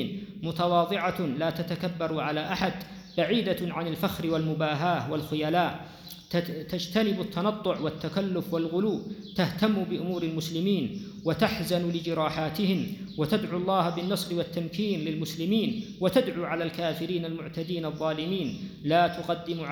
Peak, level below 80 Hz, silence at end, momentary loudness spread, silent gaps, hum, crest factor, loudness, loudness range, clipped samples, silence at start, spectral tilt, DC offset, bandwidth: -10 dBFS; -58 dBFS; 0 s; 7 LU; none; none; 18 dB; -29 LUFS; 1 LU; under 0.1%; 0 s; -6 dB/octave; under 0.1%; over 20 kHz